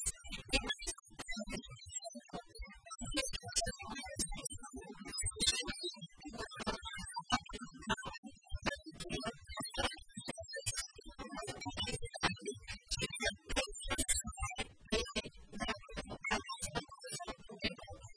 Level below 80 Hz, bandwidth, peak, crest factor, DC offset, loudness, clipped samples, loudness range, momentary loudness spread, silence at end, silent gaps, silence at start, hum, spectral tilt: -52 dBFS; 11 kHz; -16 dBFS; 26 dB; under 0.1%; -40 LUFS; under 0.1%; 4 LU; 12 LU; 0.05 s; 8.18-8.23 s; 0 s; none; -2 dB/octave